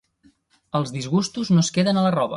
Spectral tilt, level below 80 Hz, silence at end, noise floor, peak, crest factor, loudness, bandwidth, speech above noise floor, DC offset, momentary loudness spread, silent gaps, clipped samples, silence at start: -5.5 dB/octave; -60 dBFS; 0 s; -60 dBFS; -8 dBFS; 14 dB; -21 LUFS; 11.5 kHz; 39 dB; under 0.1%; 7 LU; none; under 0.1%; 0.75 s